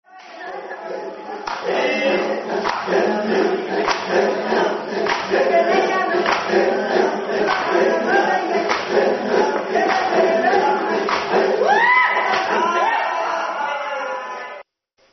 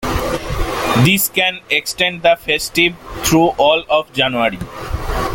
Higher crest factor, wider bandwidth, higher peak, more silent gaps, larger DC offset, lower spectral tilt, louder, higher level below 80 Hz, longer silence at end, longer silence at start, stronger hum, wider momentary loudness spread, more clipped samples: about the same, 16 dB vs 16 dB; second, 6.4 kHz vs 17 kHz; second, -4 dBFS vs 0 dBFS; neither; neither; second, -1.5 dB/octave vs -4 dB/octave; second, -18 LUFS vs -15 LUFS; second, -62 dBFS vs -30 dBFS; first, 0.5 s vs 0 s; first, 0.15 s vs 0 s; neither; first, 12 LU vs 9 LU; neither